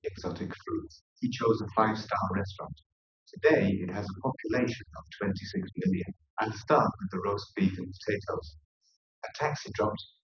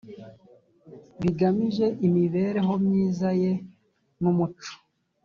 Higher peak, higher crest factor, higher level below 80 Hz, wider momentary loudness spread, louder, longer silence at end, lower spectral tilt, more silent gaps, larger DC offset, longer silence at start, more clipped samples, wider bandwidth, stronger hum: about the same, -10 dBFS vs -12 dBFS; first, 22 dB vs 14 dB; first, -54 dBFS vs -60 dBFS; about the same, 13 LU vs 13 LU; second, -31 LUFS vs -25 LUFS; second, 0.15 s vs 0.5 s; second, -6.5 dB/octave vs -8.5 dB/octave; first, 1.01-1.16 s, 2.86-3.26 s, 6.30-6.37 s, 8.65-8.81 s, 8.96-9.22 s vs none; neither; about the same, 0.05 s vs 0.05 s; neither; about the same, 7 kHz vs 7 kHz; neither